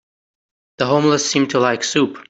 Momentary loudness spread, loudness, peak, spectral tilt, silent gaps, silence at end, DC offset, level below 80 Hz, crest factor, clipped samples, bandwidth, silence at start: 3 LU; -17 LUFS; -2 dBFS; -4 dB/octave; none; 0.1 s; under 0.1%; -60 dBFS; 16 dB; under 0.1%; 8.2 kHz; 0.8 s